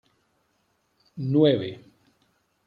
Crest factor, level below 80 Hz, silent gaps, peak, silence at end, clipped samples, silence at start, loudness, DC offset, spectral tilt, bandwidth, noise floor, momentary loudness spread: 20 dB; -70 dBFS; none; -8 dBFS; 0.9 s; under 0.1%; 1.15 s; -23 LUFS; under 0.1%; -9.5 dB/octave; 5.2 kHz; -71 dBFS; 25 LU